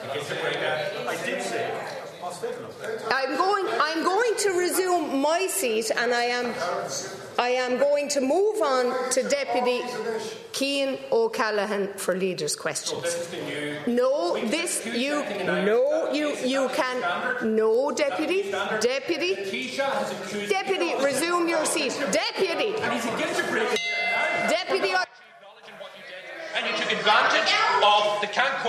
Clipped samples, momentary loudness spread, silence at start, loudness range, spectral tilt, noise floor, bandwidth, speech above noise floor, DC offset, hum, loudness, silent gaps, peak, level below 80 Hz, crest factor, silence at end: under 0.1%; 8 LU; 0 s; 3 LU; -2.5 dB/octave; -49 dBFS; 14 kHz; 24 dB; under 0.1%; none; -25 LUFS; none; -4 dBFS; -74 dBFS; 22 dB; 0 s